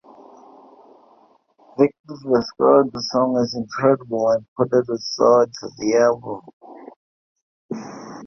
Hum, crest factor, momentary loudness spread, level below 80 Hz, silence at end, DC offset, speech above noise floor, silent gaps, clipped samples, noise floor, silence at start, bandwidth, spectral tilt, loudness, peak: none; 18 dB; 18 LU; -62 dBFS; 0 s; under 0.1%; 37 dB; 1.99-2.04 s, 4.48-4.56 s, 6.53-6.60 s, 6.96-7.35 s, 7.42-7.69 s; under 0.1%; -56 dBFS; 1.8 s; 6.6 kHz; -5.5 dB/octave; -19 LUFS; -2 dBFS